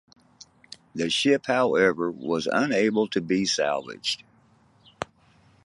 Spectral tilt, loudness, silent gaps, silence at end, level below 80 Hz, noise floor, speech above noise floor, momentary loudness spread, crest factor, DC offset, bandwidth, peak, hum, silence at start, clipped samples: -4 dB/octave; -24 LUFS; none; 0.6 s; -64 dBFS; -60 dBFS; 36 dB; 16 LU; 20 dB; under 0.1%; 11.5 kHz; -8 dBFS; none; 0.95 s; under 0.1%